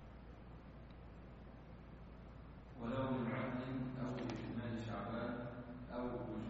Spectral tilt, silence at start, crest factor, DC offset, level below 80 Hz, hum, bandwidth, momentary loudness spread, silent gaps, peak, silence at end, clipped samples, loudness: -6.5 dB/octave; 0 s; 18 dB; under 0.1%; -60 dBFS; none; 7.6 kHz; 16 LU; none; -28 dBFS; 0 s; under 0.1%; -44 LUFS